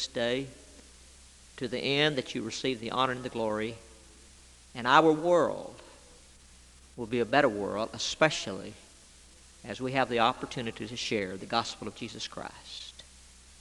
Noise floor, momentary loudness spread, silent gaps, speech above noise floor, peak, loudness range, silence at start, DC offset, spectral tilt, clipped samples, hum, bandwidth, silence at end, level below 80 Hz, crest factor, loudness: -55 dBFS; 18 LU; none; 25 dB; -6 dBFS; 4 LU; 0 s; under 0.1%; -4 dB/octave; under 0.1%; none; 12 kHz; 0.1 s; -60 dBFS; 26 dB; -29 LUFS